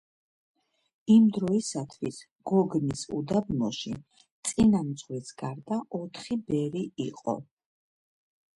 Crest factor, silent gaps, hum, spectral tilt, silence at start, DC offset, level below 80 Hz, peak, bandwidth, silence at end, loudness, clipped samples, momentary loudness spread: 18 dB; 2.31-2.36 s, 4.31-4.43 s; none; -6 dB/octave; 1.05 s; under 0.1%; -58 dBFS; -10 dBFS; 11.5 kHz; 1.1 s; -28 LUFS; under 0.1%; 15 LU